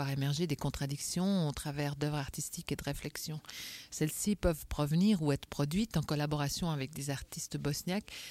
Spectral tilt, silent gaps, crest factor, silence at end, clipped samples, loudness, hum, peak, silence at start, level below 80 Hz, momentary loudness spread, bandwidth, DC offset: -5 dB/octave; none; 18 dB; 0 s; under 0.1%; -35 LUFS; none; -18 dBFS; 0 s; -50 dBFS; 8 LU; 16.5 kHz; under 0.1%